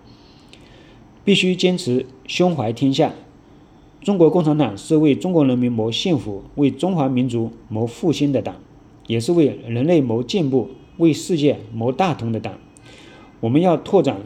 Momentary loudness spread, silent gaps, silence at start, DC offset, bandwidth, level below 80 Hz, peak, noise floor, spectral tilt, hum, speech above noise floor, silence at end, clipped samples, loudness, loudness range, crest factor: 9 LU; none; 1.25 s; under 0.1%; 12.5 kHz; -54 dBFS; -2 dBFS; -47 dBFS; -6.5 dB/octave; none; 29 dB; 0 s; under 0.1%; -19 LUFS; 3 LU; 18 dB